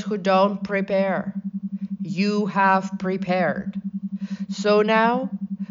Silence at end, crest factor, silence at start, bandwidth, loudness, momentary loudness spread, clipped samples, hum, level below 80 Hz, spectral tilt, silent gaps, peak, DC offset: 0.05 s; 16 dB; 0 s; 7.6 kHz; -23 LUFS; 12 LU; under 0.1%; none; -64 dBFS; -6.5 dB/octave; none; -6 dBFS; under 0.1%